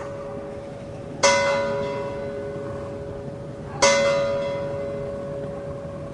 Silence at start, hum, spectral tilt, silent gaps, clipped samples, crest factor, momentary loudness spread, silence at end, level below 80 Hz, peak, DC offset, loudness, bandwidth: 0 s; none; -3 dB/octave; none; under 0.1%; 22 dB; 16 LU; 0 s; -50 dBFS; -4 dBFS; under 0.1%; -25 LUFS; 11 kHz